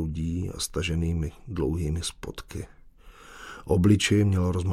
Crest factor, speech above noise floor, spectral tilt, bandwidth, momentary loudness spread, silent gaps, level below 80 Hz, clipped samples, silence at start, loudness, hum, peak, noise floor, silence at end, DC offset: 18 dB; 24 dB; -5.5 dB/octave; 15 kHz; 19 LU; none; -40 dBFS; under 0.1%; 0 s; -26 LUFS; none; -8 dBFS; -50 dBFS; 0 s; under 0.1%